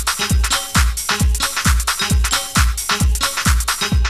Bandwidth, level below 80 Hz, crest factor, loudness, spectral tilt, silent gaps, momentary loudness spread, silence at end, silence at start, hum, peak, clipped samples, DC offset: 16 kHz; -20 dBFS; 16 dB; -17 LUFS; -2.5 dB/octave; none; 1 LU; 0 s; 0 s; none; -2 dBFS; under 0.1%; under 0.1%